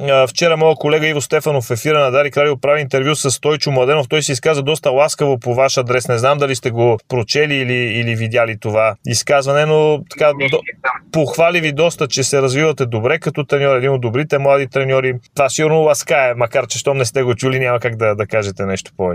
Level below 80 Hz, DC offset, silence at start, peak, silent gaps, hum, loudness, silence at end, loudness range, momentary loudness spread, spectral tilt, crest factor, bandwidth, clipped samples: -54 dBFS; under 0.1%; 0 s; 0 dBFS; none; none; -15 LUFS; 0 s; 1 LU; 5 LU; -4.5 dB/octave; 14 dB; 16 kHz; under 0.1%